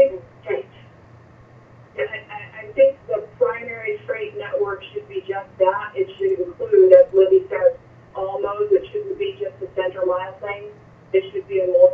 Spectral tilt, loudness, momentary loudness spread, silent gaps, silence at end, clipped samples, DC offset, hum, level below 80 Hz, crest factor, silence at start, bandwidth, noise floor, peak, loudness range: -8 dB/octave; -20 LUFS; 16 LU; none; 0 s; under 0.1%; under 0.1%; none; -60 dBFS; 20 dB; 0 s; 3.6 kHz; -47 dBFS; 0 dBFS; 7 LU